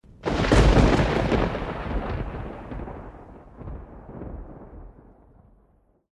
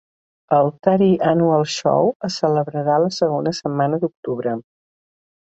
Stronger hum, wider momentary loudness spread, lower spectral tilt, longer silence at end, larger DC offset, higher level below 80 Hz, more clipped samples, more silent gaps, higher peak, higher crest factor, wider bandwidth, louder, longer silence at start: neither; first, 25 LU vs 8 LU; about the same, -6.5 dB/octave vs -6.5 dB/octave; first, 1.25 s vs 0.8 s; neither; first, -30 dBFS vs -60 dBFS; neither; second, none vs 2.15-2.20 s, 4.17-4.23 s; about the same, -4 dBFS vs -2 dBFS; about the same, 22 dB vs 18 dB; first, 11 kHz vs 8.2 kHz; second, -23 LUFS vs -19 LUFS; second, 0.2 s vs 0.5 s